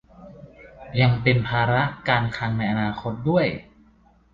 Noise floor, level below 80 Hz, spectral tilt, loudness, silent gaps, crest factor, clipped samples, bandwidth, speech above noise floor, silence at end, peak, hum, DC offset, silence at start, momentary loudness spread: -56 dBFS; -48 dBFS; -8.5 dB/octave; -22 LUFS; none; 18 dB; under 0.1%; 7 kHz; 35 dB; 0.7 s; -6 dBFS; none; under 0.1%; 0.2 s; 7 LU